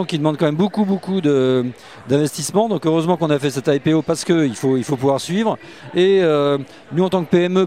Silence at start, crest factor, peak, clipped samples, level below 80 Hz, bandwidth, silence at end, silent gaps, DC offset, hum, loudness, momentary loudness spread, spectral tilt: 0 s; 16 dB; -2 dBFS; under 0.1%; -60 dBFS; 15.5 kHz; 0 s; none; 0.2%; none; -18 LUFS; 5 LU; -6 dB/octave